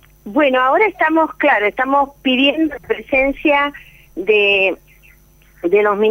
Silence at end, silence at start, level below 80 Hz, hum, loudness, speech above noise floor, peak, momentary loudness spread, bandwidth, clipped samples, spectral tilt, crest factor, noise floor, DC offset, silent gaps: 0 s; 0.25 s; -46 dBFS; none; -15 LUFS; 33 dB; -2 dBFS; 9 LU; 16 kHz; under 0.1%; -5.5 dB/octave; 14 dB; -48 dBFS; under 0.1%; none